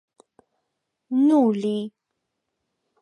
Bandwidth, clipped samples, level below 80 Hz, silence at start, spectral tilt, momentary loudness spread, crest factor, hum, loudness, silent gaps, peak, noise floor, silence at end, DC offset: 10.5 kHz; under 0.1%; -80 dBFS; 1.1 s; -8 dB/octave; 12 LU; 16 dB; none; -21 LUFS; none; -8 dBFS; -80 dBFS; 1.15 s; under 0.1%